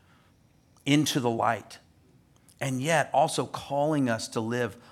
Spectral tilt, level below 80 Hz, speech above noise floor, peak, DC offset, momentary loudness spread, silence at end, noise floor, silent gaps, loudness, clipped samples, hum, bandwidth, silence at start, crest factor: -4.5 dB/octave; -68 dBFS; 35 dB; -8 dBFS; under 0.1%; 10 LU; 0.1 s; -62 dBFS; none; -27 LUFS; under 0.1%; none; 16 kHz; 0.85 s; 22 dB